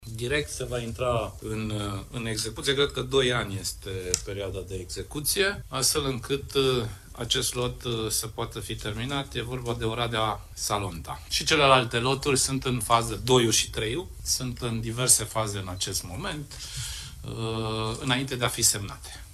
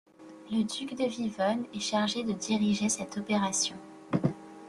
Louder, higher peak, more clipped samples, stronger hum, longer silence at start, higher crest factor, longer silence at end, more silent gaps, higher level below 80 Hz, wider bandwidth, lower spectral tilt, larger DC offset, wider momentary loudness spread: first, -27 LUFS vs -30 LUFS; first, -4 dBFS vs -14 dBFS; neither; neither; second, 0 s vs 0.2 s; first, 24 dB vs 18 dB; about the same, 0 s vs 0 s; neither; first, -44 dBFS vs -68 dBFS; first, 15 kHz vs 12.5 kHz; about the same, -3 dB/octave vs -4 dB/octave; neither; first, 13 LU vs 6 LU